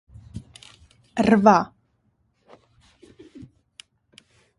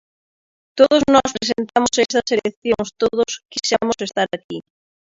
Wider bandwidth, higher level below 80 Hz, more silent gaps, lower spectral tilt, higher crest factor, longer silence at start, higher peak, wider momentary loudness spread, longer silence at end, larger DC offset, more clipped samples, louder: first, 11.5 kHz vs 7.8 kHz; about the same, -56 dBFS vs -52 dBFS; second, none vs 2.57-2.62 s, 4.44-4.49 s; first, -6.5 dB/octave vs -3 dB/octave; first, 24 dB vs 18 dB; second, 0.35 s vs 0.75 s; about the same, 0 dBFS vs 0 dBFS; first, 26 LU vs 9 LU; first, 1.15 s vs 0.5 s; neither; neither; about the same, -19 LUFS vs -18 LUFS